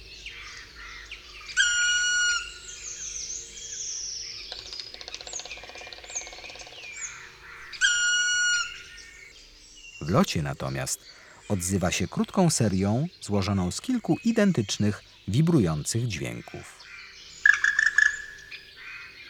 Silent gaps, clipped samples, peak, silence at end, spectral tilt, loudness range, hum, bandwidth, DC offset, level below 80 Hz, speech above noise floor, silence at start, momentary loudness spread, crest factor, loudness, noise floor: none; under 0.1%; -4 dBFS; 0 s; -3.5 dB/octave; 9 LU; none; 17.5 kHz; under 0.1%; -54 dBFS; 24 dB; 0 s; 20 LU; 24 dB; -26 LUFS; -50 dBFS